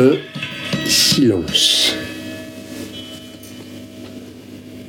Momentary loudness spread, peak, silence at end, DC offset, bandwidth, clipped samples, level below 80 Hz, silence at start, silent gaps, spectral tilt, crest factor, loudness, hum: 23 LU; -2 dBFS; 0 s; under 0.1%; 17 kHz; under 0.1%; -50 dBFS; 0 s; none; -3 dB/octave; 18 dB; -15 LUFS; none